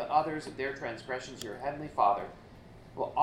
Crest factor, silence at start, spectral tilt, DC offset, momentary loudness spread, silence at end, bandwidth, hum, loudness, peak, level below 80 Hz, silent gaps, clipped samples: 22 dB; 0 s; -5 dB/octave; under 0.1%; 21 LU; 0 s; 16 kHz; none; -33 LUFS; -10 dBFS; -60 dBFS; none; under 0.1%